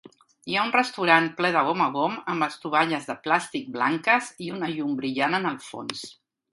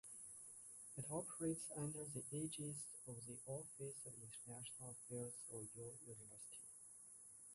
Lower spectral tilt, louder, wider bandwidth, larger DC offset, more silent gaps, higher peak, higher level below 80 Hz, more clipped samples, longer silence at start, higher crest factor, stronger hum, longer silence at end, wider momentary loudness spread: about the same, -4.5 dB/octave vs -4.5 dB/octave; first, -24 LUFS vs -51 LUFS; about the same, 11.5 kHz vs 12 kHz; neither; neither; first, -2 dBFS vs -34 dBFS; first, -74 dBFS vs -82 dBFS; neither; first, 0.45 s vs 0.05 s; about the same, 22 dB vs 18 dB; neither; first, 0.4 s vs 0 s; first, 14 LU vs 10 LU